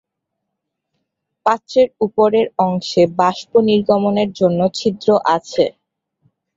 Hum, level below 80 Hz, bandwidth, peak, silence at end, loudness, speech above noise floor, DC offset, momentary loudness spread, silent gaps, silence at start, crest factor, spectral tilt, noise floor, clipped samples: none; -58 dBFS; 7.8 kHz; -2 dBFS; 0.85 s; -16 LUFS; 62 dB; under 0.1%; 5 LU; none; 1.45 s; 16 dB; -6 dB/octave; -78 dBFS; under 0.1%